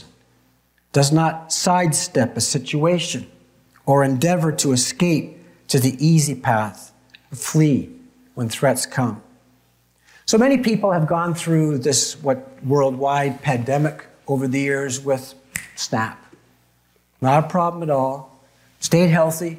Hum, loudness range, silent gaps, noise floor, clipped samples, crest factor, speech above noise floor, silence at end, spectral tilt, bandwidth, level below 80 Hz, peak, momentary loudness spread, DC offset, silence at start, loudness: 60 Hz at -45 dBFS; 4 LU; none; -61 dBFS; under 0.1%; 18 dB; 42 dB; 0 s; -5 dB/octave; 16 kHz; -60 dBFS; -2 dBFS; 11 LU; under 0.1%; 0.95 s; -19 LUFS